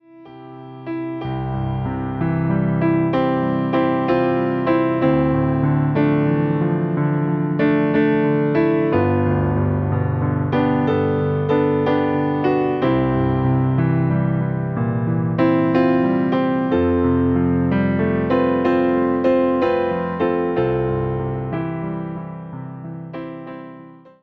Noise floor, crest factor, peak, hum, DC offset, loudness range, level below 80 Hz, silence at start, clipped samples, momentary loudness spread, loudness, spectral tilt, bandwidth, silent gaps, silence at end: -41 dBFS; 14 dB; -4 dBFS; none; under 0.1%; 4 LU; -42 dBFS; 0.15 s; under 0.1%; 10 LU; -19 LUFS; -10.5 dB/octave; 5.4 kHz; none; 0.25 s